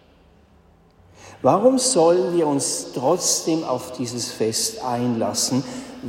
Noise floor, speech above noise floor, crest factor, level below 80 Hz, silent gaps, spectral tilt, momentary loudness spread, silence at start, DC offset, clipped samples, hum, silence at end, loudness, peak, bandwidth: -54 dBFS; 33 dB; 18 dB; -60 dBFS; none; -4 dB/octave; 10 LU; 1.2 s; under 0.1%; under 0.1%; none; 0 s; -20 LUFS; -4 dBFS; 16.5 kHz